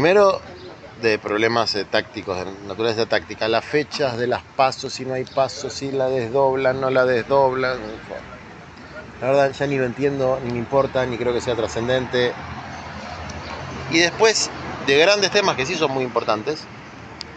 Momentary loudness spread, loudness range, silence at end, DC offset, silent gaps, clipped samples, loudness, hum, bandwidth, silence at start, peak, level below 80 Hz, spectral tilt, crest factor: 17 LU; 4 LU; 0 s; under 0.1%; none; under 0.1%; -20 LUFS; none; 9 kHz; 0 s; -2 dBFS; -50 dBFS; -4 dB/octave; 18 dB